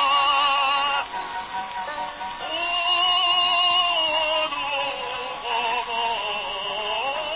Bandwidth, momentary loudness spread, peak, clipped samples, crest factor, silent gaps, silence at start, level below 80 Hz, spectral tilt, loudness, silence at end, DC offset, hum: 4 kHz; 13 LU; -10 dBFS; under 0.1%; 14 dB; none; 0 s; -56 dBFS; 3 dB/octave; -22 LUFS; 0 s; under 0.1%; none